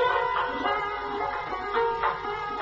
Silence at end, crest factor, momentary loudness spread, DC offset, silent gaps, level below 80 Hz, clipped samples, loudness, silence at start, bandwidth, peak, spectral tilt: 0 s; 16 dB; 6 LU; under 0.1%; none; -52 dBFS; under 0.1%; -28 LUFS; 0 s; 7.6 kHz; -12 dBFS; -1 dB/octave